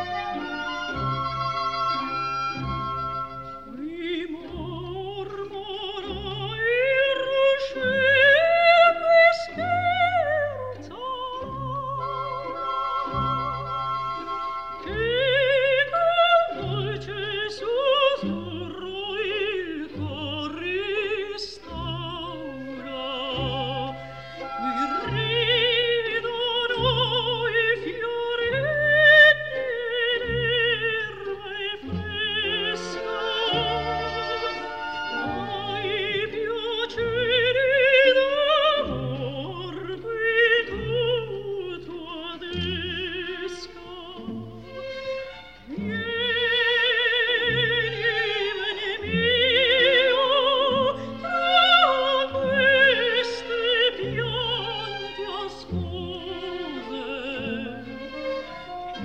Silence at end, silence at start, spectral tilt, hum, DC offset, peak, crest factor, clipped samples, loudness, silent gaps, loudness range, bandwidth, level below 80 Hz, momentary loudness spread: 0 s; 0 s; -5 dB/octave; none; 0.3%; -4 dBFS; 20 dB; under 0.1%; -23 LUFS; none; 12 LU; 8.8 kHz; -50 dBFS; 16 LU